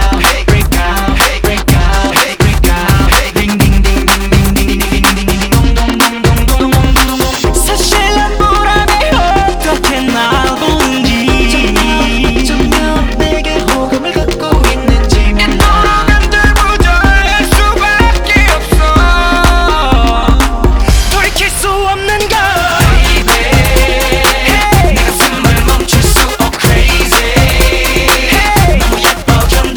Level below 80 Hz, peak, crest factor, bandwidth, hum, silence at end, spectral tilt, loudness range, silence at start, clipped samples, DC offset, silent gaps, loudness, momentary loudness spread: -12 dBFS; 0 dBFS; 8 dB; over 20 kHz; none; 0 s; -4 dB/octave; 2 LU; 0 s; 0.5%; under 0.1%; none; -9 LUFS; 4 LU